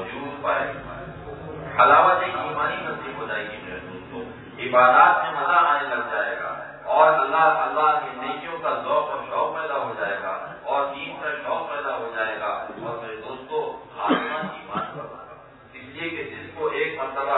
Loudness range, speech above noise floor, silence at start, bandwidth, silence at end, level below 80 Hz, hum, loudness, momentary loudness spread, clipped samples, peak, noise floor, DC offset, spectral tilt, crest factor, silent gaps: 10 LU; 25 dB; 0 s; 4.1 kHz; 0 s; -58 dBFS; none; -23 LUFS; 18 LU; under 0.1%; -2 dBFS; -45 dBFS; under 0.1%; -8 dB/octave; 22 dB; none